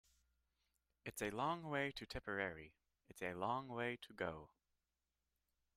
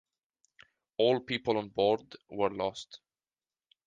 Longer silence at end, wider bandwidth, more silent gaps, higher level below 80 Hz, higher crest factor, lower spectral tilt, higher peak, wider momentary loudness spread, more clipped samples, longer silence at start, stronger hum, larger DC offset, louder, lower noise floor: first, 1.3 s vs 0.9 s; first, 14.5 kHz vs 9.2 kHz; neither; about the same, -70 dBFS vs -68 dBFS; about the same, 22 dB vs 20 dB; about the same, -4.5 dB/octave vs -5.5 dB/octave; second, -26 dBFS vs -14 dBFS; about the same, 14 LU vs 16 LU; neither; about the same, 1.05 s vs 1 s; neither; neither; second, -45 LUFS vs -31 LUFS; about the same, under -90 dBFS vs under -90 dBFS